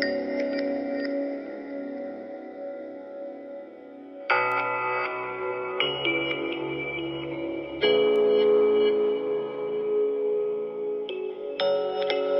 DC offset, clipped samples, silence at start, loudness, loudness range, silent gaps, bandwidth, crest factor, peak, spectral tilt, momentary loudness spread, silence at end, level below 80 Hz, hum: under 0.1%; under 0.1%; 0 s; -26 LUFS; 9 LU; none; 5.8 kHz; 18 dB; -8 dBFS; -6.5 dB/octave; 17 LU; 0 s; -66 dBFS; none